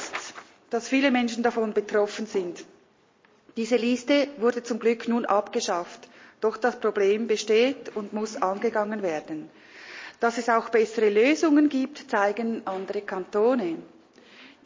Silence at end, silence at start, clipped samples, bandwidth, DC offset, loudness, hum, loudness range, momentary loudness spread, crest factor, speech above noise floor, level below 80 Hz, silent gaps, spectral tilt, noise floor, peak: 0.2 s; 0 s; under 0.1%; 7.6 kHz; under 0.1%; -25 LUFS; none; 3 LU; 16 LU; 18 dB; 36 dB; -76 dBFS; none; -4 dB/octave; -61 dBFS; -8 dBFS